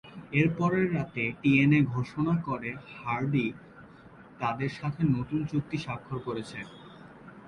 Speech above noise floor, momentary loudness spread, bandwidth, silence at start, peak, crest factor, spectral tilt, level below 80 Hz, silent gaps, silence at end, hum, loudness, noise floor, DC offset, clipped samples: 23 dB; 17 LU; 10 kHz; 0.05 s; -10 dBFS; 18 dB; -8 dB/octave; -58 dBFS; none; 0 s; none; -29 LUFS; -51 dBFS; under 0.1%; under 0.1%